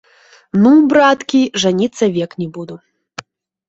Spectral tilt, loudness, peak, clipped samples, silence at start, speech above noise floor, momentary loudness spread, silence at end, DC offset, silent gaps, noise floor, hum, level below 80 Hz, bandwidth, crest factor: -5.5 dB/octave; -13 LUFS; -2 dBFS; under 0.1%; 0.55 s; 23 dB; 24 LU; 0.9 s; under 0.1%; none; -36 dBFS; none; -56 dBFS; 8 kHz; 14 dB